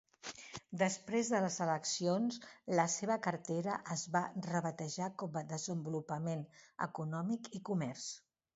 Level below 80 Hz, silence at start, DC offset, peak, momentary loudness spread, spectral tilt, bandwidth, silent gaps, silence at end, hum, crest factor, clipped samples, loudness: -80 dBFS; 0.25 s; under 0.1%; -16 dBFS; 11 LU; -5 dB/octave; 8 kHz; none; 0.35 s; none; 22 dB; under 0.1%; -38 LUFS